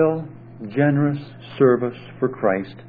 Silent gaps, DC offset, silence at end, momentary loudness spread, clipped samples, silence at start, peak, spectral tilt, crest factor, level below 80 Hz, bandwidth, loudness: none; under 0.1%; 0 s; 17 LU; under 0.1%; 0 s; -2 dBFS; -11.5 dB/octave; 18 dB; -60 dBFS; 4.9 kHz; -21 LUFS